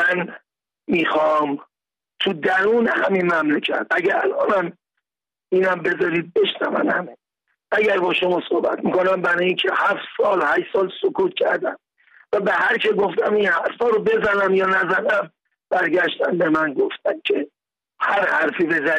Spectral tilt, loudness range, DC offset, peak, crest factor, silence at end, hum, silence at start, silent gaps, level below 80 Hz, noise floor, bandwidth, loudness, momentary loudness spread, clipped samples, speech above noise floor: -6 dB/octave; 2 LU; under 0.1%; -8 dBFS; 12 dB; 0 s; none; 0 s; none; -62 dBFS; under -90 dBFS; 9.6 kHz; -20 LUFS; 6 LU; under 0.1%; over 71 dB